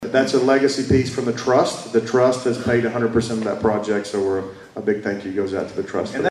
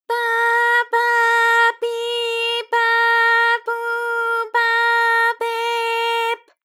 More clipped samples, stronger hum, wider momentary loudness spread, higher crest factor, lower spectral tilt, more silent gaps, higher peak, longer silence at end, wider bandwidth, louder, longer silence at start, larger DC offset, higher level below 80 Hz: neither; neither; about the same, 8 LU vs 8 LU; about the same, 14 dB vs 12 dB; first, -5.5 dB/octave vs 4 dB/octave; neither; about the same, -6 dBFS vs -6 dBFS; second, 0 s vs 0.25 s; second, 12 kHz vs 16.5 kHz; second, -20 LUFS vs -17 LUFS; about the same, 0 s vs 0.1 s; neither; first, -48 dBFS vs under -90 dBFS